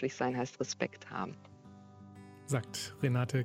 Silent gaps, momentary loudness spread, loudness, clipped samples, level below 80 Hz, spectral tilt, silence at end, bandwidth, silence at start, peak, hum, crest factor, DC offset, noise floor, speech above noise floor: none; 22 LU; -36 LUFS; under 0.1%; -72 dBFS; -5.5 dB/octave; 0 s; 15.5 kHz; 0 s; -14 dBFS; none; 22 dB; under 0.1%; -55 dBFS; 20 dB